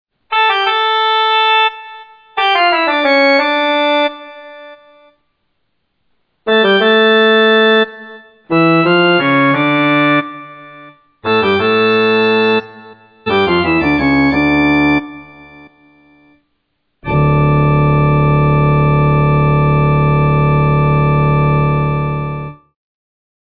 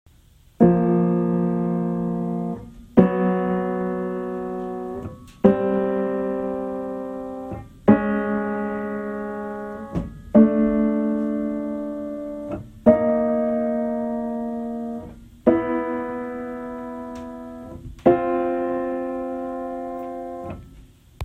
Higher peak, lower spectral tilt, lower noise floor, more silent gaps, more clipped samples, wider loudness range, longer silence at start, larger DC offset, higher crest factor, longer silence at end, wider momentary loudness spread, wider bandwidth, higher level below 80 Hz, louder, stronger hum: about the same, -2 dBFS vs 0 dBFS; second, -8.5 dB/octave vs -10 dB/octave; first, -67 dBFS vs -53 dBFS; neither; neither; about the same, 5 LU vs 4 LU; second, 0.3 s vs 0.6 s; neither; second, 12 dB vs 22 dB; first, 0.95 s vs 0 s; about the same, 13 LU vs 15 LU; first, 5.4 kHz vs 4 kHz; first, -32 dBFS vs -48 dBFS; first, -12 LUFS vs -23 LUFS; neither